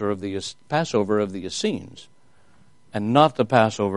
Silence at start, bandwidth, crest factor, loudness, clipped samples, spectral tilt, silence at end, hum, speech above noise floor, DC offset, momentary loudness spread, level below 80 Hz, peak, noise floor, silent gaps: 0 s; 11.5 kHz; 22 dB; -22 LUFS; under 0.1%; -5.5 dB/octave; 0 s; none; 37 dB; 0.3%; 14 LU; -62 dBFS; -2 dBFS; -59 dBFS; none